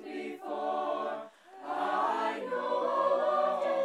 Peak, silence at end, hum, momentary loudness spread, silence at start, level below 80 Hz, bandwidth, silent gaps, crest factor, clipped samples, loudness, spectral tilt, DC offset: -18 dBFS; 0 s; none; 12 LU; 0 s; under -90 dBFS; 11.5 kHz; none; 14 dB; under 0.1%; -32 LUFS; -4.5 dB/octave; under 0.1%